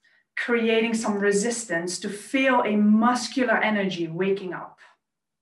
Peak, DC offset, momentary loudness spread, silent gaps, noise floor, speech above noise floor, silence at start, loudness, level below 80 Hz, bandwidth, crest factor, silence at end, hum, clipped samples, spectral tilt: -8 dBFS; under 0.1%; 11 LU; none; -70 dBFS; 47 dB; 0.35 s; -23 LUFS; -72 dBFS; 12 kHz; 16 dB; 0.7 s; none; under 0.1%; -4.5 dB/octave